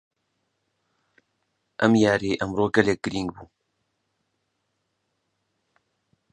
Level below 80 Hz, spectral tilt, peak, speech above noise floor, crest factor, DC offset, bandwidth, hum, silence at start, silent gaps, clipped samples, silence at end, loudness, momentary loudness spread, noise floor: -56 dBFS; -6 dB/octave; -2 dBFS; 54 dB; 26 dB; under 0.1%; 10 kHz; none; 1.8 s; none; under 0.1%; 2.9 s; -23 LUFS; 12 LU; -76 dBFS